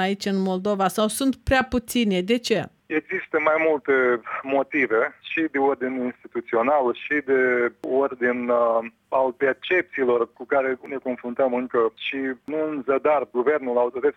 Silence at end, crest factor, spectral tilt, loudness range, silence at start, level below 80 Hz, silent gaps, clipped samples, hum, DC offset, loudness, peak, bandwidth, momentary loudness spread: 0.05 s; 16 dB; -5 dB/octave; 2 LU; 0 s; -50 dBFS; none; under 0.1%; none; under 0.1%; -23 LUFS; -6 dBFS; 17.5 kHz; 7 LU